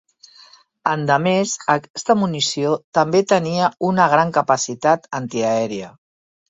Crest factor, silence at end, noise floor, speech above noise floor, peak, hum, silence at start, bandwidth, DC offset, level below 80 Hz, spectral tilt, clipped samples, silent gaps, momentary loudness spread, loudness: 18 dB; 0.6 s; -49 dBFS; 31 dB; -2 dBFS; none; 0.85 s; 8.2 kHz; under 0.1%; -62 dBFS; -4.5 dB/octave; under 0.1%; 1.90-1.94 s, 2.84-2.92 s; 7 LU; -18 LUFS